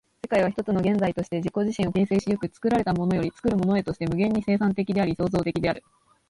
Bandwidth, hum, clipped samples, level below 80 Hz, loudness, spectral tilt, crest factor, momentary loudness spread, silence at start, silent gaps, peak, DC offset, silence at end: 11 kHz; none; under 0.1%; -50 dBFS; -25 LUFS; -7.5 dB/octave; 14 dB; 4 LU; 0.25 s; none; -10 dBFS; under 0.1%; 0.5 s